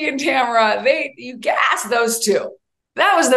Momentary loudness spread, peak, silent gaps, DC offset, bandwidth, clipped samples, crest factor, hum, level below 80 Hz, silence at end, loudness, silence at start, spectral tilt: 10 LU; -2 dBFS; none; under 0.1%; 13 kHz; under 0.1%; 16 dB; none; -72 dBFS; 0 s; -17 LUFS; 0 s; -1.5 dB/octave